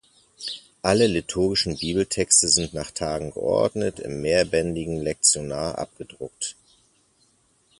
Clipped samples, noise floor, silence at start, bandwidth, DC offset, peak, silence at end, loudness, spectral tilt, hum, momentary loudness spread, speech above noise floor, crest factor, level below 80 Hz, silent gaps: under 0.1%; -63 dBFS; 0.4 s; 11.5 kHz; under 0.1%; -4 dBFS; 1.25 s; -23 LUFS; -3 dB/octave; none; 16 LU; 40 dB; 22 dB; -48 dBFS; none